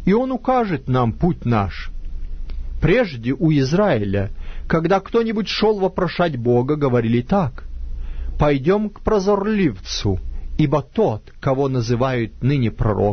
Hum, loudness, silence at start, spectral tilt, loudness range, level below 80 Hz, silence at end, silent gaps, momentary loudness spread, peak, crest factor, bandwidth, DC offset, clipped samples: none; -19 LUFS; 0 s; -7 dB/octave; 2 LU; -30 dBFS; 0 s; none; 15 LU; -4 dBFS; 16 dB; 6.6 kHz; under 0.1%; under 0.1%